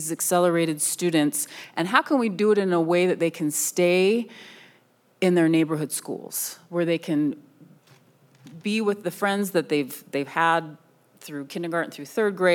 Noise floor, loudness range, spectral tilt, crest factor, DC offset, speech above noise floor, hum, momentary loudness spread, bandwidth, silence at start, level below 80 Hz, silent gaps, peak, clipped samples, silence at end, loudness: -60 dBFS; 6 LU; -4.5 dB/octave; 22 dB; under 0.1%; 37 dB; none; 10 LU; 19 kHz; 0 s; -88 dBFS; none; -2 dBFS; under 0.1%; 0 s; -24 LUFS